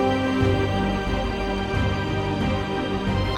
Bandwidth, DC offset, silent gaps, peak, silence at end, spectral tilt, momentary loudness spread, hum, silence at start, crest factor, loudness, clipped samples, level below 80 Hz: 11.5 kHz; under 0.1%; none; -8 dBFS; 0 s; -6.5 dB/octave; 4 LU; none; 0 s; 14 dB; -24 LUFS; under 0.1%; -32 dBFS